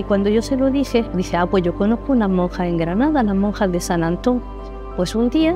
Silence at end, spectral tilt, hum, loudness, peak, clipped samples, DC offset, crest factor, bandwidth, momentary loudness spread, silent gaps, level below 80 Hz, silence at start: 0 s; -6.5 dB/octave; none; -19 LUFS; -4 dBFS; under 0.1%; under 0.1%; 14 dB; 15 kHz; 5 LU; none; -32 dBFS; 0 s